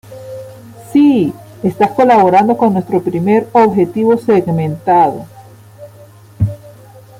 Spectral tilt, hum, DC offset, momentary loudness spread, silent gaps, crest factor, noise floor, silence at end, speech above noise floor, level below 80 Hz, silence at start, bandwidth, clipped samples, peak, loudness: -8.5 dB/octave; none; under 0.1%; 20 LU; none; 12 dB; -39 dBFS; 0.5 s; 28 dB; -48 dBFS; 0.1 s; 16 kHz; under 0.1%; -2 dBFS; -12 LUFS